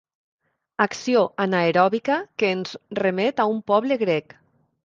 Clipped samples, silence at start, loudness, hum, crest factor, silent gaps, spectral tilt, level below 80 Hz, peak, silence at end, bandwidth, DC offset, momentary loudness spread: under 0.1%; 0.8 s; -22 LUFS; none; 20 dB; none; -5.5 dB/octave; -68 dBFS; -4 dBFS; 0.65 s; 7.6 kHz; under 0.1%; 6 LU